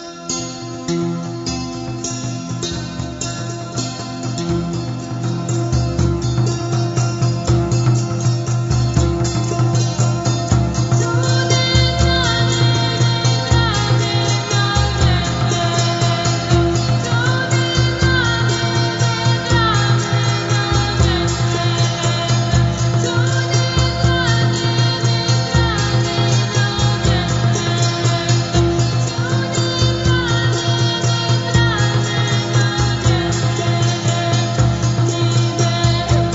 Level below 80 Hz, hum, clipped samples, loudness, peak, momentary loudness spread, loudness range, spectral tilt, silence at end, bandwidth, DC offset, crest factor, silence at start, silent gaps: -30 dBFS; none; under 0.1%; -17 LUFS; -2 dBFS; 8 LU; 5 LU; -5 dB/octave; 0 s; 7.8 kHz; under 0.1%; 14 dB; 0 s; none